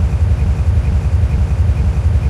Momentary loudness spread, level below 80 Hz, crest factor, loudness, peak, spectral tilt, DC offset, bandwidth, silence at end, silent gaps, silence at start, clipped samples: 1 LU; -16 dBFS; 10 dB; -15 LUFS; -4 dBFS; -8 dB/octave; under 0.1%; 10 kHz; 0 s; none; 0 s; under 0.1%